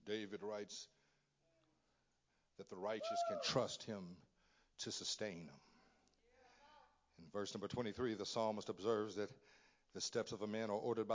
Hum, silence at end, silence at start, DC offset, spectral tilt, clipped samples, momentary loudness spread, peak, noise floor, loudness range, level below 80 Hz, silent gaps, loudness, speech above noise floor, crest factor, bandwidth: none; 0 s; 0.05 s; under 0.1%; -4 dB/octave; under 0.1%; 14 LU; -26 dBFS; -83 dBFS; 6 LU; -78 dBFS; none; -44 LUFS; 38 dB; 20 dB; 7.8 kHz